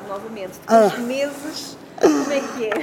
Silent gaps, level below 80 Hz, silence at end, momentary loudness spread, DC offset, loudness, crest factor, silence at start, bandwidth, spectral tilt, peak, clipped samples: none; -64 dBFS; 0 s; 16 LU; under 0.1%; -20 LUFS; 18 dB; 0 s; 17.5 kHz; -4 dB/octave; -2 dBFS; under 0.1%